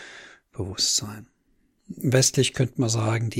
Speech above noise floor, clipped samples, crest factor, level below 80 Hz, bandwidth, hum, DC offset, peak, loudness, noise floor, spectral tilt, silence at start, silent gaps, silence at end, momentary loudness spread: 43 dB; under 0.1%; 20 dB; -56 dBFS; 17 kHz; none; under 0.1%; -6 dBFS; -23 LUFS; -66 dBFS; -4 dB/octave; 0 s; none; 0 s; 23 LU